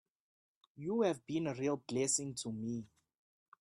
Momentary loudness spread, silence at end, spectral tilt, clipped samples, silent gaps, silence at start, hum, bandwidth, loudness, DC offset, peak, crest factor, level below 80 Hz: 9 LU; 0.75 s; -4.5 dB/octave; under 0.1%; none; 0.75 s; none; 13.5 kHz; -37 LUFS; under 0.1%; -20 dBFS; 20 dB; -78 dBFS